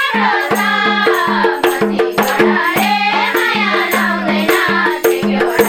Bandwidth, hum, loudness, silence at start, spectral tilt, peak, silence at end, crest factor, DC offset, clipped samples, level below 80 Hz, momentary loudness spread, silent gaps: 19 kHz; none; -13 LUFS; 0 s; -4 dB/octave; 0 dBFS; 0 s; 14 dB; under 0.1%; under 0.1%; -52 dBFS; 2 LU; none